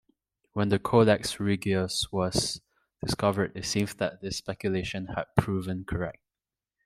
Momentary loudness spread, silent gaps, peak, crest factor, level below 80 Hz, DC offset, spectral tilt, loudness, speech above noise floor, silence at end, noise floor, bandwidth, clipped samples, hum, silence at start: 10 LU; none; -6 dBFS; 22 dB; -52 dBFS; under 0.1%; -5 dB/octave; -28 LUFS; over 62 dB; 0.75 s; under -90 dBFS; 15.5 kHz; under 0.1%; none; 0.55 s